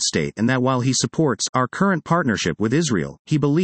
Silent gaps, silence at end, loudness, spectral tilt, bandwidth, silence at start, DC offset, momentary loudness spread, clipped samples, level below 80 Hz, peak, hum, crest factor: 1.49-1.53 s, 3.19-3.25 s; 0 s; -20 LUFS; -4.5 dB/octave; 8.8 kHz; 0 s; under 0.1%; 3 LU; under 0.1%; -54 dBFS; -4 dBFS; none; 16 dB